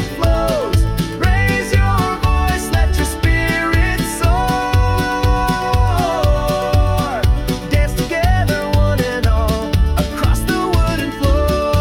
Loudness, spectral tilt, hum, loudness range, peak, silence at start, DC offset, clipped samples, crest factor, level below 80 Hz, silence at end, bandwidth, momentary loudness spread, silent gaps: -16 LUFS; -5.5 dB/octave; none; 1 LU; -4 dBFS; 0 s; under 0.1%; under 0.1%; 10 dB; -18 dBFS; 0 s; 17.5 kHz; 2 LU; none